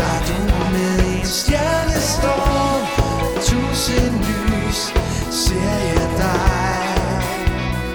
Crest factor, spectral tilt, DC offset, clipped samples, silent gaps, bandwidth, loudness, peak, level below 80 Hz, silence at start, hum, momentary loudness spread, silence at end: 16 dB; -4.5 dB/octave; 0.2%; under 0.1%; none; over 20 kHz; -18 LUFS; -2 dBFS; -24 dBFS; 0 s; none; 3 LU; 0 s